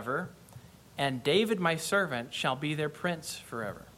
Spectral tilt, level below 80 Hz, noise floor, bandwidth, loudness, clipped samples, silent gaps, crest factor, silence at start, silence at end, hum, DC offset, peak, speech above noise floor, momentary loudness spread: -4.5 dB/octave; -66 dBFS; -52 dBFS; 16.5 kHz; -31 LUFS; under 0.1%; none; 20 dB; 0 s; 0 s; none; under 0.1%; -12 dBFS; 21 dB; 11 LU